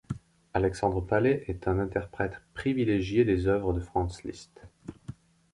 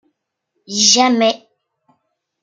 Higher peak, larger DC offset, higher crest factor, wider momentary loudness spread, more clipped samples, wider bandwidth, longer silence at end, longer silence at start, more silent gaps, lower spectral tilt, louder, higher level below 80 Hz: second, -10 dBFS vs 0 dBFS; neither; about the same, 18 dB vs 18 dB; first, 20 LU vs 14 LU; neither; about the same, 11.5 kHz vs 11 kHz; second, 0.45 s vs 1.05 s; second, 0.1 s vs 0.7 s; neither; first, -7.5 dB/octave vs -1.5 dB/octave; second, -29 LUFS vs -13 LUFS; first, -44 dBFS vs -68 dBFS